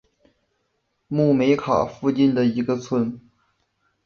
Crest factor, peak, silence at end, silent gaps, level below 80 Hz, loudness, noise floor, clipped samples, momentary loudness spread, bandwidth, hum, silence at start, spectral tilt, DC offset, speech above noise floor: 18 dB; -6 dBFS; 0.85 s; none; -58 dBFS; -21 LUFS; -72 dBFS; under 0.1%; 9 LU; 6.8 kHz; none; 1.1 s; -7.5 dB/octave; under 0.1%; 52 dB